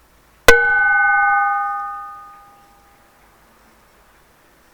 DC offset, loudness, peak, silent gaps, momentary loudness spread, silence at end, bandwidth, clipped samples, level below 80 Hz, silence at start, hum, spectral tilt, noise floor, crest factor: under 0.1%; -14 LUFS; 0 dBFS; none; 20 LU; 2.45 s; over 20 kHz; under 0.1%; -38 dBFS; 0.5 s; none; -1.5 dB/octave; -52 dBFS; 20 dB